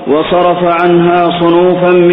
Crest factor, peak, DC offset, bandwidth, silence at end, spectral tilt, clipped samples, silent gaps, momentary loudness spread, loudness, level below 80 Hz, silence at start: 8 dB; 0 dBFS; 0.4%; 4 kHz; 0 s; -9.5 dB/octave; under 0.1%; none; 2 LU; -9 LUFS; -44 dBFS; 0 s